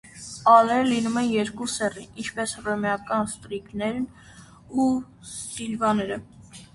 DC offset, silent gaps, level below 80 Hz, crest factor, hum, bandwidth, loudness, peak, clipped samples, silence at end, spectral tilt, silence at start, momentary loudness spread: under 0.1%; none; -56 dBFS; 22 dB; none; 11.5 kHz; -24 LUFS; -4 dBFS; under 0.1%; 0.1 s; -4.5 dB/octave; 0.05 s; 17 LU